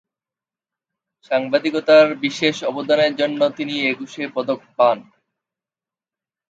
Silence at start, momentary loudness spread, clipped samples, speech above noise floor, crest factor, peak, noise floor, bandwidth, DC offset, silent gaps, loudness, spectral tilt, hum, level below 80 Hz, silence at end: 1.3 s; 12 LU; under 0.1%; over 72 dB; 20 dB; -2 dBFS; under -90 dBFS; 7.8 kHz; under 0.1%; none; -19 LUFS; -4.5 dB/octave; none; -74 dBFS; 1.5 s